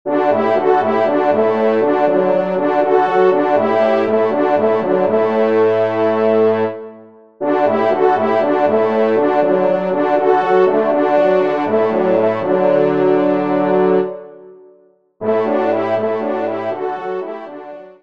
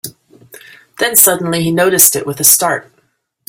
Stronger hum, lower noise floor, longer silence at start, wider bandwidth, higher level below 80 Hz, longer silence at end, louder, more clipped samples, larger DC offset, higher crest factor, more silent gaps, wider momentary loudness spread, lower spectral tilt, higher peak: neither; second, -51 dBFS vs -60 dBFS; about the same, 0.05 s vs 0.05 s; second, 6.2 kHz vs over 20 kHz; second, -66 dBFS vs -56 dBFS; second, 0.1 s vs 0.7 s; second, -15 LUFS vs -10 LUFS; second, under 0.1% vs 0.4%; first, 0.5% vs under 0.1%; about the same, 14 dB vs 14 dB; neither; about the same, 8 LU vs 10 LU; first, -8 dB/octave vs -2.5 dB/octave; about the same, -2 dBFS vs 0 dBFS